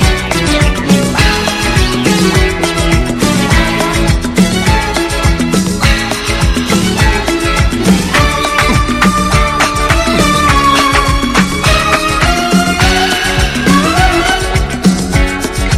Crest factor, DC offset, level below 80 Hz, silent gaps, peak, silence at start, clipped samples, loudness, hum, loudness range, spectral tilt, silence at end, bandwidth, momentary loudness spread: 10 dB; under 0.1%; -18 dBFS; none; 0 dBFS; 0 s; 0.5%; -10 LUFS; none; 2 LU; -4.5 dB/octave; 0 s; 15.5 kHz; 3 LU